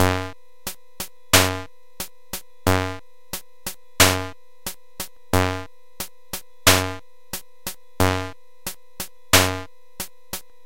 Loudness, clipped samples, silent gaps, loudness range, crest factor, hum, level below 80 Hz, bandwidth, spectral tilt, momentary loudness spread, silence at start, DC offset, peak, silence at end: -20 LUFS; under 0.1%; none; 2 LU; 24 dB; none; -44 dBFS; 17 kHz; -3 dB/octave; 18 LU; 0 s; 1%; 0 dBFS; 0.25 s